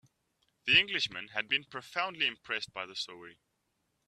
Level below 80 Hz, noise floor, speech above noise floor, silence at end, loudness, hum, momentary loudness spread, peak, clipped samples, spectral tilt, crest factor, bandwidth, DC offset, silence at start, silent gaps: -72 dBFS; -80 dBFS; 46 dB; 0.75 s; -31 LUFS; none; 14 LU; -10 dBFS; under 0.1%; -2 dB/octave; 24 dB; 14 kHz; under 0.1%; 0.65 s; none